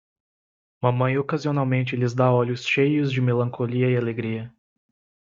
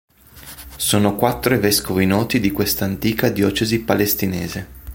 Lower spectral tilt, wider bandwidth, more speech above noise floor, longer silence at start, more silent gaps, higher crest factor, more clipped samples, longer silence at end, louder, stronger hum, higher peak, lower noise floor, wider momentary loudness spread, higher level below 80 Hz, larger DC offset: first, -7.5 dB/octave vs -4.5 dB/octave; second, 7.4 kHz vs 17 kHz; first, over 68 dB vs 23 dB; first, 0.8 s vs 0.35 s; neither; about the same, 18 dB vs 18 dB; neither; first, 0.8 s vs 0 s; second, -23 LUFS vs -18 LUFS; neither; second, -4 dBFS vs 0 dBFS; first, under -90 dBFS vs -41 dBFS; second, 7 LU vs 11 LU; second, -64 dBFS vs -42 dBFS; neither